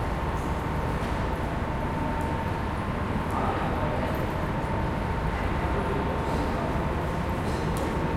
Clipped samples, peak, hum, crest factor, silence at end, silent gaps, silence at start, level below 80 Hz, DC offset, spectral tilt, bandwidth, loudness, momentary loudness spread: under 0.1%; -14 dBFS; none; 14 dB; 0 s; none; 0 s; -34 dBFS; under 0.1%; -7 dB/octave; 16 kHz; -29 LUFS; 2 LU